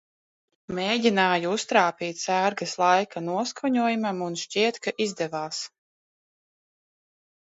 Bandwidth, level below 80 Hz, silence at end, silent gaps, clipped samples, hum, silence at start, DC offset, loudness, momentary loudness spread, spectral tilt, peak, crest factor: 8 kHz; -72 dBFS; 1.8 s; none; under 0.1%; none; 0.7 s; under 0.1%; -25 LUFS; 9 LU; -3.5 dB/octave; -6 dBFS; 22 dB